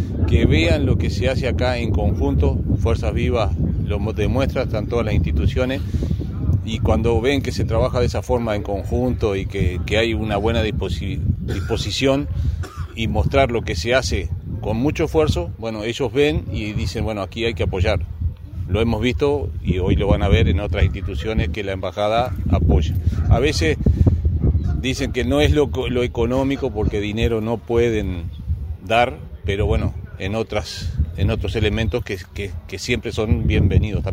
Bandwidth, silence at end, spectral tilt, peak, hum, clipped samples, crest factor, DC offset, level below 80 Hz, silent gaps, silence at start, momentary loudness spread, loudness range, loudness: 14.5 kHz; 0 s; -6.5 dB/octave; 0 dBFS; none; under 0.1%; 18 dB; under 0.1%; -26 dBFS; none; 0 s; 8 LU; 3 LU; -20 LUFS